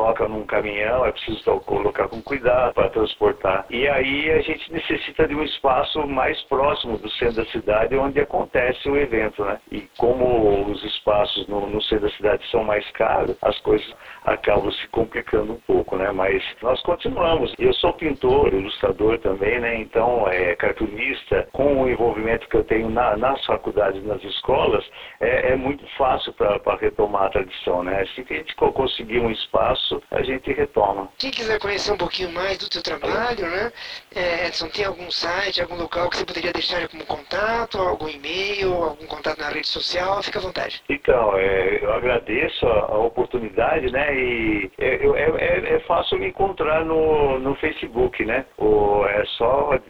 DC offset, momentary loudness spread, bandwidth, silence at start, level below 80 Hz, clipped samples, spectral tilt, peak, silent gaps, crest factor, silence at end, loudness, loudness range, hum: 0.4%; 6 LU; 11.5 kHz; 0 s; -40 dBFS; under 0.1%; -5.5 dB/octave; -2 dBFS; none; 20 dB; 0.05 s; -21 LUFS; 3 LU; none